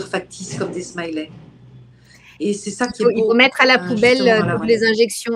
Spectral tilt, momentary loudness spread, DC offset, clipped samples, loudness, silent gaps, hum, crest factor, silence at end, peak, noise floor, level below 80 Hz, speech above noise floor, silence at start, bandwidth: -4 dB/octave; 14 LU; under 0.1%; under 0.1%; -17 LUFS; none; none; 18 dB; 0 s; 0 dBFS; -47 dBFS; -56 dBFS; 30 dB; 0 s; 12.5 kHz